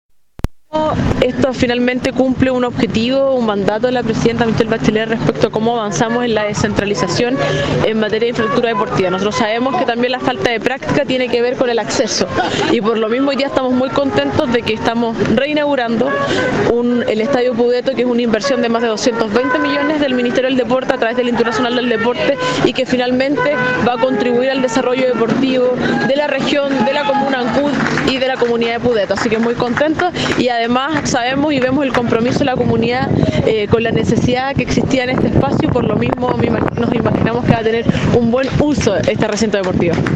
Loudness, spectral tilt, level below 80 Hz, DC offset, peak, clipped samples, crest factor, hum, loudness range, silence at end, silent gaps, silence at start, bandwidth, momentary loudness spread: -15 LUFS; -5.5 dB/octave; -38 dBFS; under 0.1%; 0 dBFS; under 0.1%; 14 dB; none; 1 LU; 0 s; none; 0.45 s; 8.8 kHz; 2 LU